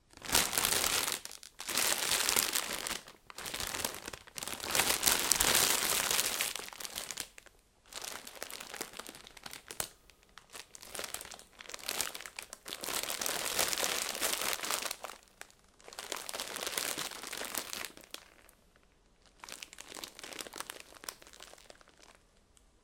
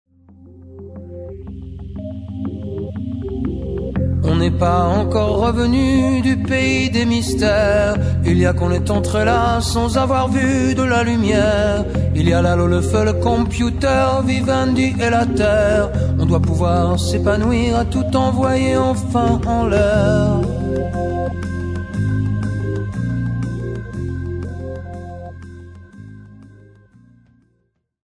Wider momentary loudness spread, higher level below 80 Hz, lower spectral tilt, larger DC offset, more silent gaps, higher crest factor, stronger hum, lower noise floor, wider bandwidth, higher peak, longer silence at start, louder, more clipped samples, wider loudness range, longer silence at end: first, 21 LU vs 14 LU; second, -62 dBFS vs -30 dBFS; second, 0 dB/octave vs -6.5 dB/octave; neither; neither; first, 38 dB vs 16 dB; neither; about the same, -66 dBFS vs -66 dBFS; first, 17 kHz vs 11 kHz; about the same, 0 dBFS vs 0 dBFS; second, 0.15 s vs 0.4 s; second, -33 LUFS vs -17 LUFS; neither; first, 17 LU vs 11 LU; second, 0.7 s vs 1.65 s